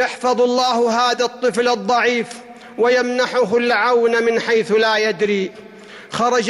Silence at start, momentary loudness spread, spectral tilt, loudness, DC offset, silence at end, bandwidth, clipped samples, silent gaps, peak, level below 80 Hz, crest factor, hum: 0 s; 7 LU; -3.5 dB/octave; -17 LUFS; under 0.1%; 0 s; 12 kHz; under 0.1%; none; -6 dBFS; -62 dBFS; 10 dB; none